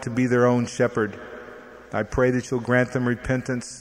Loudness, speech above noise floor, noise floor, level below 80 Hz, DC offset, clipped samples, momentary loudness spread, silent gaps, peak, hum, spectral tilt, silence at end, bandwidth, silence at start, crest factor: -23 LUFS; 20 dB; -43 dBFS; -46 dBFS; under 0.1%; under 0.1%; 19 LU; none; -6 dBFS; none; -6.5 dB/octave; 0 s; 11 kHz; 0 s; 18 dB